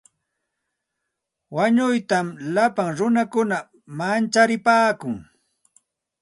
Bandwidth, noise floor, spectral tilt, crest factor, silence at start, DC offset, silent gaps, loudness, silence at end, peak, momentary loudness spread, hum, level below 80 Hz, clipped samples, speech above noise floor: 11.5 kHz; -81 dBFS; -5 dB/octave; 18 dB; 1.5 s; under 0.1%; none; -21 LUFS; 1 s; -4 dBFS; 12 LU; none; -66 dBFS; under 0.1%; 60 dB